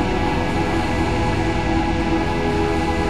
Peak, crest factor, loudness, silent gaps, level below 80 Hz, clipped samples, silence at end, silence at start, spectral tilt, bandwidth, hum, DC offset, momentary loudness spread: -8 dBFS; 12 dB; -20 LUFS; none; -28 dBFS; under 0.1%; 0 s; 0 s; -6.5 dB/octave; 12.5 kHz; none; 2%; 1 LU